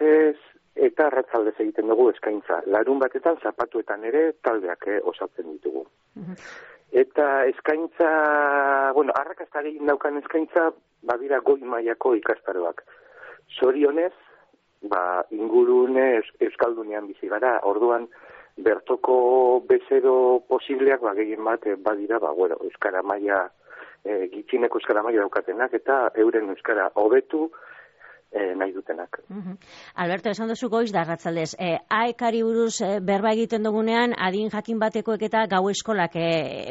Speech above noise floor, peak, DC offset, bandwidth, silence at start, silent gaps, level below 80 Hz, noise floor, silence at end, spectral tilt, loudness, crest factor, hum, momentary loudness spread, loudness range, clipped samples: 35 dB; -8 dBFS; under 0.1%; 8 kHz; 0 s; none; -70 dBFS; -58 dBFS; 0 s; -3.5 dB/octave; -23 LUFS; 16 dB; none; 12 LU; 5 LU; under 0.1%